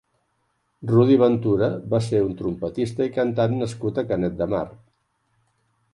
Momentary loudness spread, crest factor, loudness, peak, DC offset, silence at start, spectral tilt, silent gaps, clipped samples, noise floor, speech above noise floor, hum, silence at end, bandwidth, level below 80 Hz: 10 LU; 16 dB; -22 LUFS; -6 dBFS; under 0.1%; 0.8 s; -8 dB/octave; none; under 0.1%; -71 dBFS; 49 dB; none; 1.2 s; 11.5 kHz; -52 dBFS